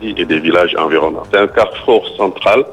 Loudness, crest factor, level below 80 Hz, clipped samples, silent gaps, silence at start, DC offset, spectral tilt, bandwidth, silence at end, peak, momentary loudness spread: -13 LUFS; 12 dB; -44 dBFS; under 0.1%; none; 0 s; 0.1%; -5.5 dB/octave; 10.5 kHz; 0 s; 0 dBFS; 3 LU